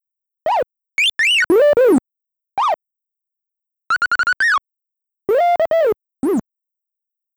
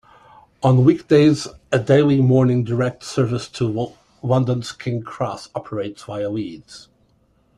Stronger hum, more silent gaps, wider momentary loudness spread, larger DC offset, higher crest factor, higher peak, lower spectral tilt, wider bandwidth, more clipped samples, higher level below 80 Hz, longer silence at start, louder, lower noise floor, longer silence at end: neither; neither; second, 11 LU vs 14 LU; neither; about the same, 12 dB vs 16 dB; second, -6 dBFS vs -2 dBFS; second, -3 dB/octave vs -7.5 dB/octave; first, over 20 kHz vs 10.5 kHz; neither; second, -60 dBFS vs -54 dBFS; second, 0.45 s vs 0.6 s; first, -16 LUFS vs -19 LUFS; first, -84 dBFS vs -60 dBFS; first, 0.95 s vs 0.8 s